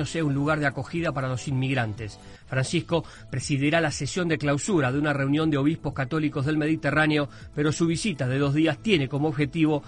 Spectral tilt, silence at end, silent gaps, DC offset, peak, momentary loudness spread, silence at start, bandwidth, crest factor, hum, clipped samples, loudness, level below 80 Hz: -5.5 dB/octave; 0 s; none; under 0.1%; -4 dBFS; 6 LU; 0 s; 10.5 kHz; 20 dB; none; under 0.1%; -25 LUFS; -50 dBFS